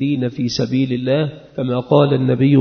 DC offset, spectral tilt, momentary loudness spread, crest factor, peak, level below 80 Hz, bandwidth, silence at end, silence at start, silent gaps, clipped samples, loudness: under 0.1%; -7.5 dB/octave; 8 LU; 16 dB; 0 dBFS; -54 dBFS; 6.6 kHz; 0 s; 0 s; none; under 0.1%; -17 LUFS